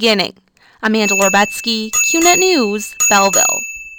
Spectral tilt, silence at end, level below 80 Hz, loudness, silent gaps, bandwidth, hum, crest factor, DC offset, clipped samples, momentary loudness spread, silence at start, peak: -1.5 dB/octave; 0 s; -50 dBFS; -13 LUFS; none; 19 kHz; none; 14 dB; under 0.1%; under 0.1%; 9 LU; 0 s; 0 dBFS